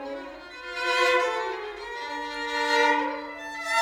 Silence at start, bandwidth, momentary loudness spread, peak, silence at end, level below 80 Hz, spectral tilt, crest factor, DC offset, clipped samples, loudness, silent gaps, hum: 0 s; 18.5 kHz; 15 LU; -10 dBFS; 0 s; -62 dBFS; -1 dB/octave; 18 dB; under 0.1%; under 0.1%; -26 LUFS; none; none